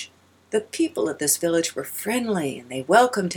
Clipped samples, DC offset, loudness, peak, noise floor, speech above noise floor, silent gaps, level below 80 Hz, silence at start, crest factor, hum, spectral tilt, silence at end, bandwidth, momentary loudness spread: under 0.1%; under 0.1%; -23 LUFS; -4 dBFS; -45 dBFS; 22 dB; none; -70 dBFS; 0 s; 20 dB; none; -3.5 dB/octave; 0 s; 19 kHz; 11 LU